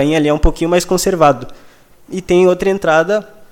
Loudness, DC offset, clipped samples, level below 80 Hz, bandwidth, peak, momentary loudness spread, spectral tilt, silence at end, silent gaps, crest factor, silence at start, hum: -14 LUFS; under 0.1%; under 0.1%; -26 dBFS; 17 kHz; 0 dBFS; 9 LU; -5 dB/octave; 0.05 s; none; 14 dB; 0 s; none